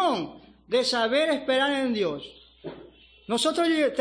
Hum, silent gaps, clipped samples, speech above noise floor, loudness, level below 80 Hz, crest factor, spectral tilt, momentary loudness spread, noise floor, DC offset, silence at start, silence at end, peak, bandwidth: none; none; under 0.1%; 26 dB; -25 LUFS; -62 dBFS; 14 dB; -3 dB/octave; 19 LU; -51 dBFS; under 0.1%; 0 s; 0 s; -12 dBFS; 10.5 kHz